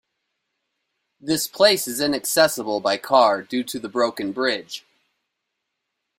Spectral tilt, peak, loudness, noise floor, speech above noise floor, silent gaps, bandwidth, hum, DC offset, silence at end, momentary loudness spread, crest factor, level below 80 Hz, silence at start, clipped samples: -2.5 dB/octave; -2 dBFS; -21 LUFS; -79 dBFS; 58 dB; none; 16 kHz; none; under 0.1%; 1.4 s; 11 LU; 20 dB; -66 dBFS; 1.25 s; under 0.1%